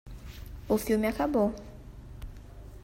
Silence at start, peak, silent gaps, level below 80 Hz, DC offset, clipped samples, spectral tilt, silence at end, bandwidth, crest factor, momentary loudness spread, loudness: 0.05 s; -14 dBFS; none; -46 dBFS; under 0.1%; under 0.1%; -6 dB/octave; 0 s; 16 kHz; 18 dB; 21 LU; -28 LUFS